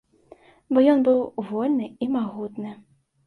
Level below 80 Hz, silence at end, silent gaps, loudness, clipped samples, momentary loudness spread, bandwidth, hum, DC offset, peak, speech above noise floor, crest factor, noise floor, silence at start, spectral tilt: -68 dBFS; 0.55 s; none; -23 LUFS; under 0.1%; 16 LU; 4.5 kHz; none; under 0.1%; -6 dBFS; 30 dB; 16 dB; -52 dBFS; 0.7 s; -8.5 dB/octave